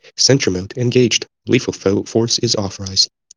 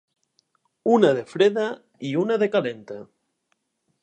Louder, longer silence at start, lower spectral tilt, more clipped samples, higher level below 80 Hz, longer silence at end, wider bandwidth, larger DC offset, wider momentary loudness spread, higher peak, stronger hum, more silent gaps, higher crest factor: first, -16 LUFS vs -22 LUFS; second, 0.2 s vs 0.85 s; second, -4 dB/octave vs -6.5 dB/octave; neither; first, -58 dBFS vs -78 dBFS; second, 0.3 s vs 1 s; first, 11 kHz vs 9.4 kHz; neither; second, 6 LU vs 18 LU; first, 0 dBFS vs -4 dBFS; neither; neither; about the same, 16 dB vs 20 dB